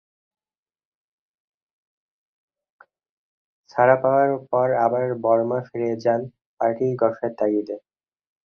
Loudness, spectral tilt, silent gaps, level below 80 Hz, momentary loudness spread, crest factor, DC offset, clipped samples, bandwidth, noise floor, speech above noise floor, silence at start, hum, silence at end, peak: -22 LUFS; -9 dB/octave; 6.46-6.57 s; -70 dBFS; 9 LU; 20 dB; under 0.1%; under 0.1%; 6.6 kHz; under -90 dBFS; over 69 dB; 3.75 s; none; 0.7 s; -4 dBFS